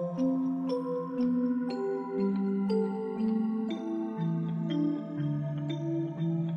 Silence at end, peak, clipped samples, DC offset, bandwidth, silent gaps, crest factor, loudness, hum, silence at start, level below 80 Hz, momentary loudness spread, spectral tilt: 0 s; -18 dBFS; under 0.1%; under 0.1%; 6.8 kHz; none; 12 dB; -31 LUFS; none; 0 s; -76 dBFS; 4 LU; -9.5 dB/octave